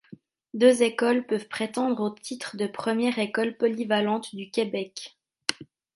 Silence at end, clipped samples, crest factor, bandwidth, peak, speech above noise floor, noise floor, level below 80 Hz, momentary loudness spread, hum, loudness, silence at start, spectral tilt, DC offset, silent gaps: 0.3 s; under 0.1%; 24 dB; 11.5 kHz; -2 dBFS; 26 dB; -51 dBFS; -76 dBFS; 13 LU; none; -26 LUFS; 0.55 s; -4 dB/octave; under 0.1%; none